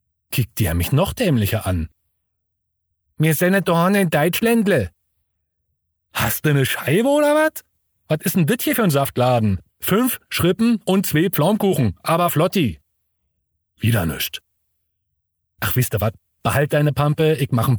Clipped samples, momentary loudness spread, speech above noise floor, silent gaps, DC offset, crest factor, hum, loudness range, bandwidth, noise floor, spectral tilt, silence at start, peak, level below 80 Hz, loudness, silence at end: under 0.1%; 8 LU; 54 dB; none; under 0.1%; 16 dB; none; 5 LU; over 20 kHz; -71 dBFS; -5.5 dB/octave; 0.3 s; -4 dBFS; -46 dBFS; -19 LUFS; 0 s